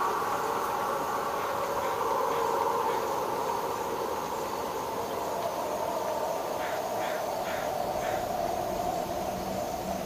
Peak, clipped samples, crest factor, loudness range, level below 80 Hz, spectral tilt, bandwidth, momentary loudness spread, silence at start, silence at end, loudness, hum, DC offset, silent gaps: -16 dBFS; under 0.1%; 14 dB; 3 LU; -56 dBFS; -4 dB/octave; 16 kHz; 5 LU; 0 s; 0 s; -31 LUFS; none; under 0.1%; none